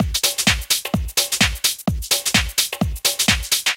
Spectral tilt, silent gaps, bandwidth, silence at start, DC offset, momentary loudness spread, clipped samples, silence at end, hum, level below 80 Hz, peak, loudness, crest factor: -2 dB/octave; none; 17 kHz; 0 s; under 0.1%; 4 LU; under 0.1%; 0 s; none; -30 dBFS; -4 dBFS; -18 LUFS; 16 dB